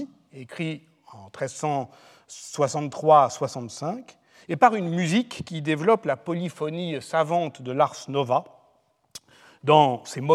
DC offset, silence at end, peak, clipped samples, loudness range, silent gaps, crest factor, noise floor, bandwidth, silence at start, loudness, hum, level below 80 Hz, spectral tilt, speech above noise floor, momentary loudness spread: under 0.1%; 0 s; -4 dBFS; under 0.1%; 4 LU; none; 22 dB; -65 dBFS; 13 kHz; 0 s; -24 LUFS; none; -72 dBFS; -5.5 dB/octave; 41 dB; 22 LU